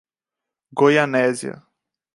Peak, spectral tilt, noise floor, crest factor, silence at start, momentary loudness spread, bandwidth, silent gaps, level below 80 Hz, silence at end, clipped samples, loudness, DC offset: -2 dBFS; -5 dB/octave; -86 dBFS; 20 dB; 0.75 s; 16 LU; 11.5 kHz; none; -72 dBFS; 0.65 s; under 0.1%; -18 LUFS; under 0.1%